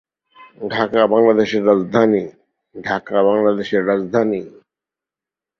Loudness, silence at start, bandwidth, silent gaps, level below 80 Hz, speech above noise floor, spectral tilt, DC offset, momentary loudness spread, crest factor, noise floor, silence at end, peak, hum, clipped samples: -17 LUFS; 0.4 s; 6.6 kHz; none; -60 dBFS; 72 dB; -7 dB/octave; under 0.1%; 11 LU; 16 dB; -88 dBFS; 1.1 s; -2 dBFS; none; under 0.1%